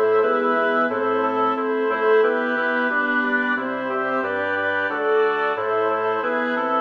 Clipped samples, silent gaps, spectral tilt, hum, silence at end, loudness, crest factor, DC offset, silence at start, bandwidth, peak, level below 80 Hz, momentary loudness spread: under 0.1%; none; -6 dB/octave; none; 0 s; -21 LUFS; 12 dB; under 0.1%; 0 s; 5.6 kHz; -8 dBFS; -70 dBFS; 4 LU